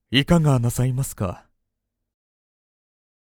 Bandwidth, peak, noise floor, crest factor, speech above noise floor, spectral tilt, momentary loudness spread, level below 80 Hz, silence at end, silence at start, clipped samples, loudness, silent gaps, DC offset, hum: 18.5 kHz; -2 dBFS; -80 dBFS; 22 dB; 60 dB; -5.5 dB/octave; 11 LU; -42 dBFS; 1.9 s; 0.1 s; under 0.1%; -21 LUFS; none; under 0.1%; none